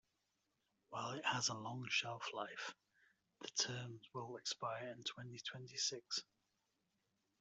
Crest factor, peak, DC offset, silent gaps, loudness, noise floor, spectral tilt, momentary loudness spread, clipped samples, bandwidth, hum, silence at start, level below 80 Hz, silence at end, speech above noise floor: 24 dB; -24 dBFS; under 0.1%; none; -44 LUFS; -86 dBFS; -2 dB/octave; 10 LU; under 0.1%; 8.2 kHz; none; 0.9 s; -86 dBFS; 1.2 s; 41 dB